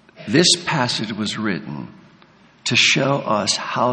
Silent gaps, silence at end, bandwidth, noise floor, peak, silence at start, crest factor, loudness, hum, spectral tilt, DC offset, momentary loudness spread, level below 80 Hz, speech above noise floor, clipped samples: none; 0 s; 10 kHz; -51 dBFS; 0 dBFS; 0.2 s; 20 dB; -18 LUFS; none; -3 dB/octave; under 0.1%; 13 LU; -60 dBFS; 32 dB; under 0.1%